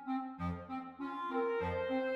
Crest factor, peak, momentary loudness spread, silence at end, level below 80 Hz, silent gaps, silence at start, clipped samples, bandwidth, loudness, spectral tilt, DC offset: 14 dB; -24 dBFS; 8 LU; 0 s; -60 dBFS; none; 0 s; under 0.1%; 6.6 kHz; -39 LUFS; -8 dB/octave; under 0.1%